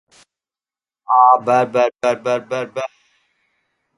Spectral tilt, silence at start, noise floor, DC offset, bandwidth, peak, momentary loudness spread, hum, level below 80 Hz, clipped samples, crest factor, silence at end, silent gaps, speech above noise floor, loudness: -5 dB/octave; 1.1 s; under -90 dBFS; under 0.1%; 11.5 kHz; 0 dBFS; 14 LU; none; -68 dBFS; under 0.1%; 18 dB; 1.1 s; none; over 74 dB; -16 LUFS